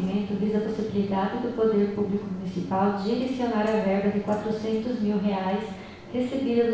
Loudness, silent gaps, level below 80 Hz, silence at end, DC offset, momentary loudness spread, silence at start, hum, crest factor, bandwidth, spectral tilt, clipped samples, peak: -26 LUFS; none; -54 dBFS; 0 s; under 0.1%; 6 LU; 0 s; none; 14 dB; 8 kHz; -8 dB/octave; under 0.1%; -12 dBFS